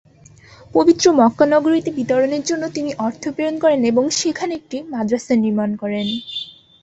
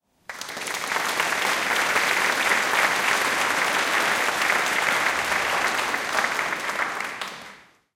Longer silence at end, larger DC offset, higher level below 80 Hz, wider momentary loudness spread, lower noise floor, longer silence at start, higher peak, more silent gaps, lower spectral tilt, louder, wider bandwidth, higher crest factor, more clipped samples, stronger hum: about the same, 0.35 s vs 0.35 s; neither; about the same, -58 dBFS vs -62 dBFS; about the same, 11 LU vs 10 LU; about the same, -46 dBFS vs -48 dBFS; first, 0.75 s vs 0.3 s; first, -2 dBFS vs -6 dBFS; neither; first, -4.5 dB/octave vs -0.5 dB/octave; first, -18 LUFS vs -22 LUFS; second, 8.2 kHz vs 17 kHz; about the same, 16 dB vs 18 dB; neither; neither